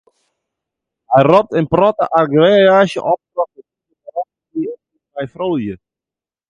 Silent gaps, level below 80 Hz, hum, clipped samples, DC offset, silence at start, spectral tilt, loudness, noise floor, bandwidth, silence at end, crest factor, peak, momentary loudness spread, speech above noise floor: none; -52 dBFS; none; under 0.1%; under 0.1%; 1.1 s; -7 dB/octave; -14 LUFS; -89 dBFS; 10.5 kHz; 0.75 s; 16 dB; 0 dBFS; 17 LU; 76 dB